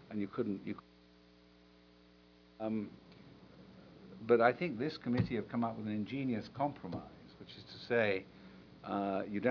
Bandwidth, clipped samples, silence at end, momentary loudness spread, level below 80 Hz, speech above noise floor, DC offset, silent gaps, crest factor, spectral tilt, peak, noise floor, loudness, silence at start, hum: 5.4 kHz; under 0.1%; 0 s; 25 LU; -68 dBFS; 28 dB; under 0.1%; none; 24 dB; -5.5 dB/octave; -14 dBFS; -63 dBFS; -36 LUFS; 0 s; 60 Hz at -65 dBFS